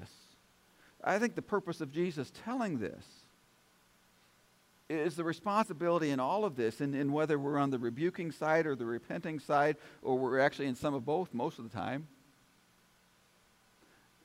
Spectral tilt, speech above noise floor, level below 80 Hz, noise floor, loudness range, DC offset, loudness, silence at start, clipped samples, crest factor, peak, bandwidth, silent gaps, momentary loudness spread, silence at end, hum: -6.5 dB/octave; 34 dB; -74 dBFS; -68 dBFS; 8 LU; under 0.1%; -34 LUFS; 0 s; under 0.1%; 18 dB; -16 dBFS; 16 kHz; none; 9 LU; 2.2 s; none